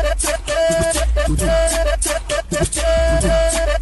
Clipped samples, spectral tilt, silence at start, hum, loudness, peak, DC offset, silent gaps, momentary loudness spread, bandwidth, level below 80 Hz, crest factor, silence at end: under 0.1%; -4 dB/octave; 0 s; none; -17 LUFS; -6 dBFS; under 0.1%; none; 4 LU; 12.5 kHz; -22 dBFS; 12 dB; 0 s